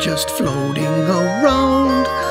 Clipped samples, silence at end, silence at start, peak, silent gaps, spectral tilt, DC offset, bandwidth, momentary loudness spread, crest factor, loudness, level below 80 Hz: under 0.1%; 0 s; 0 s; 0 dBFS; none; -5 dB/octave; under 0.1%; 16 kHz; 5 LU; 16 dB; -16 LUFS; -38 dBFS